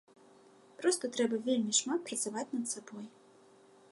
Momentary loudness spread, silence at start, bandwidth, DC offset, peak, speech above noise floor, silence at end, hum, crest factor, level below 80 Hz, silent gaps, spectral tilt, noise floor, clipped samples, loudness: 15 LU; 0.8 s; 11.5 kHz; under 0.1%; -14 dBFS; 27 dB; 0.8 s; none; 22 dB; -88 dBFS; none; -2.5 dB/octave; -61 dBFS; under 0.1%; -33 LUFS